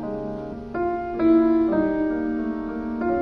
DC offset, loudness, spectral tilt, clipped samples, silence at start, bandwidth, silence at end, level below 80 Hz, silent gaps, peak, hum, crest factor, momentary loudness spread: under 0.1%; -23 LUFS; -9.5 dB/octave; under 0.1%; 0 s; 5 kHz; 0 s; -46 dBFS; none; -10 dBFS; none; 14 dB; 13 LU